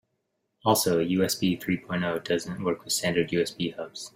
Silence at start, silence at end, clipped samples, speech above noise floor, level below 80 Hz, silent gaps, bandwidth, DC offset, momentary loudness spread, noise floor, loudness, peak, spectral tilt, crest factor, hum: 0.65 s; 0.1 s; under 0.1%; 51 dB; -62 dBFS; none; 16 kHz; under 0.1%; 7 LU; -78 dBFS; -27 LUFS; -8 dBFS; -4 dB/octave; 20 dB; none